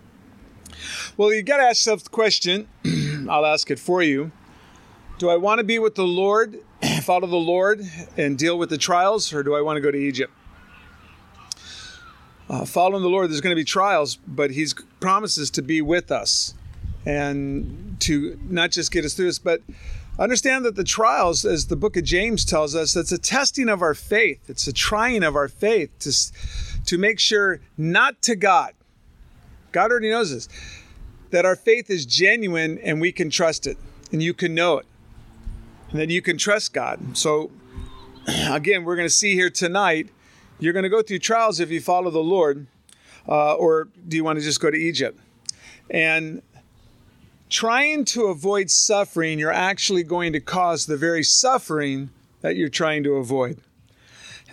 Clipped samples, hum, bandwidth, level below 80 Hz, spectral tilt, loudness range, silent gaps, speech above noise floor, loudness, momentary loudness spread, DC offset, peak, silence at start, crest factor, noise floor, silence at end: under 0.1%; none; 15 kHz; -42 dBFS; -3 dB/octave; 4 LU; none; 33 dB; -20 LUFS; 14 LU; under 0.1%; -2 dBFS; 0.65 s; 20 dB; -53 dBFS; 0.15 s